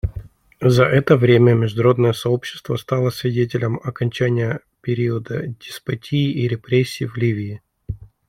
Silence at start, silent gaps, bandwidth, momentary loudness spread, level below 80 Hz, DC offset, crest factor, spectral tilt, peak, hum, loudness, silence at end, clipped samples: 0.05 s; none; 15.5 kHz; 15 LU; -42 dBFS; under 0.1%; 18 dB; -7.5 dB/octave; -2 dBFS; none; -19 LUFS; 0.25 s; under 0.1%